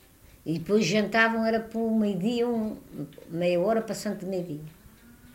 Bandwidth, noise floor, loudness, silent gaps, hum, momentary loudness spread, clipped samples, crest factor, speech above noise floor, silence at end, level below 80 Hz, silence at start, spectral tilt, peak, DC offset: 16 kHz; -52 dBFS; -27 LUFS; none; none; 17 LU; under 0.1%; 20 dB; 25 dB; 0.05 s; -60 dBFS; 0.45 s; -5.5 dB/octave; -8 dBFS; under 0.1%